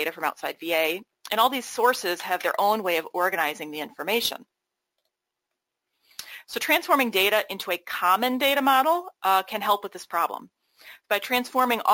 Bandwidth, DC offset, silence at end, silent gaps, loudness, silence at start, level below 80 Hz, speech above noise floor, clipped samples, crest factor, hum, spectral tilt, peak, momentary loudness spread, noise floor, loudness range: 17 kHz; under 0.1%; 0 s; none; -24 LUFS; 0 s; -70 dBFS; 60 dB; under 0.1%; 20 dB; none; -2 dB/octave; -6 dBFS; 12 LU; -84 dBFS; 7 LU